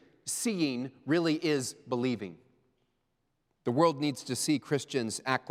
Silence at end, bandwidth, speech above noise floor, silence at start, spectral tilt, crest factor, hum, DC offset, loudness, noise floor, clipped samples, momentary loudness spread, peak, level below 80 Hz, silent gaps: 0 s; 16 kHz; 48 dB; 0.25 s; -4.5 dB/octave; 20 dB; none; under 0.1%; -31 LUFS; -78 dBFS; under 0.1%; 9 LU; -12 dBFS; -80 dBFS; none